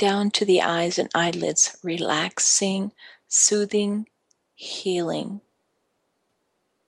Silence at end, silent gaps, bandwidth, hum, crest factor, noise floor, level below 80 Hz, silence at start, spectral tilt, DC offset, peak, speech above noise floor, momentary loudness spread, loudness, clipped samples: 1.5 s; none; 12 kHz; none; 18 dB; -73 dBFS; -72 dBFS; 0 s; -2.5 dB/octave; under 0.1%; -6 dBFS; 50 dB; 15 LU; -22 LUFS; under 0.1%